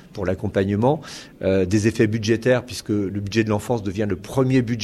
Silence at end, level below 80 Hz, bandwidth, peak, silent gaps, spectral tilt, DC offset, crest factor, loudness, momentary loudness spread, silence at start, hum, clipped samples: 0 s; -48 dBFS; 13.5 kHz; -4 dBFS; none; -6.5 dB/octave; under 0.1%; 16 dB; -22 LUFS; 7 LU; 0.15 s; none; under 0.1%